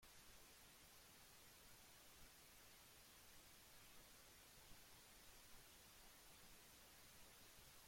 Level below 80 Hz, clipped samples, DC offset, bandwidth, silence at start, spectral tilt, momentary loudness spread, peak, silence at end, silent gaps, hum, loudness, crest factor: -76 dBFS; under 0.1%; under 0.1%; 16.5 kHz; 0 s; -1.5 dB/octave; 1 LU; -50 dBFS; 0 s; none; none; -65 LUFS; 16 dB